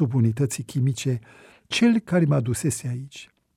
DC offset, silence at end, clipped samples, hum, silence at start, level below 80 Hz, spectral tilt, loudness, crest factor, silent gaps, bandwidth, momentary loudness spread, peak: under 0.1%; 0.3 s; under 0.1%; none; 0 s; -58 dBFS; -6 dB/octave; -24 LUFS; 14 dB; none; 15 kHz; 12 LU; -10 dBFS